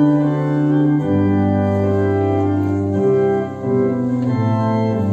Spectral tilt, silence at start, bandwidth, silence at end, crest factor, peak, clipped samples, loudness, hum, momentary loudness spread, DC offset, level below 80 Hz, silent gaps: -10 dB/octave; 0 s; 8 kHz; 0 s; 12 dB; -4 dBFS; under 0.1%; -17 LUFS; none; 3 LU; under 0.1%; -38 dBFS; none